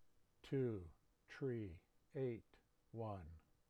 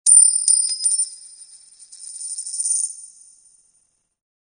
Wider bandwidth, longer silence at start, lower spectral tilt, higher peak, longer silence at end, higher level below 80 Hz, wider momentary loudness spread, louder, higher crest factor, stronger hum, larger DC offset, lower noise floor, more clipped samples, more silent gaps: about the same, 10 kHz vs 10 kHz; about the same, 0 s vs 0.05 s; first, -9 dB/octave vs 7 dB/octave; second, -34 dBFS vs -2 dBFS; second, 0.3 s vs 1.45 s; first, -70 dBFS vs -82 dBFS; second, 19 LU vs 26 LU; second, -48 LUFS vs -16 LUFS; about the same, 16 dB vs 20 dB; neither; neither; about the same, -67 dBFS vs -65 dBFS; neither; neither